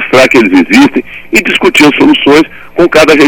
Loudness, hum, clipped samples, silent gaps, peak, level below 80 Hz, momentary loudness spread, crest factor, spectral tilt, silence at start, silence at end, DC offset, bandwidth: -5 LUFS; none; 8%; none; 0 dBFS; -38 dBFS; 6 LU; 6 dB; -4 dB/octave; 0 s; 0 s; under 0.1%; 18.5 kHz